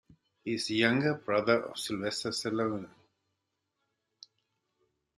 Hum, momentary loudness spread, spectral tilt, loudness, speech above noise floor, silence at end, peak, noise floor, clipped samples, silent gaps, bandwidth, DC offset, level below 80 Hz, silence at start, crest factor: none; 11 LU; -4.5 dB/octave; -31 LUFS; 52 dB; 2.3 s; -12 dBFS; -83 dBFS; under 0.1%; none; 13 kHz; under 0.1%; -72 dBFS; 0.45 s; 22 dB